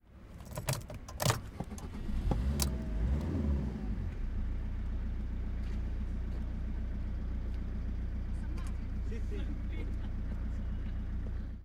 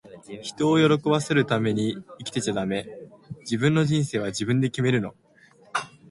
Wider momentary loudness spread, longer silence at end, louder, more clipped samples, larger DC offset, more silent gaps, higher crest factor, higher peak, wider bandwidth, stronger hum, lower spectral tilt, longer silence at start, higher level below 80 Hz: second, 6 LU vs 16 LU; second, 0 s vs 0.25 s; second, -38 LUFS vs -24 LUFS; neither; neither; neither; about the same, 22 dB vs 18 dB; second, -12 dBFS vs -6 dBFS; first, 16.5 kHz vs 11.5 kHz; neither; about the same, -5.5 dB/octave vs -6 dB/octave; about the same, 0.1 s vs 0.05 s; first, -36 dBFS vs -60 dBFS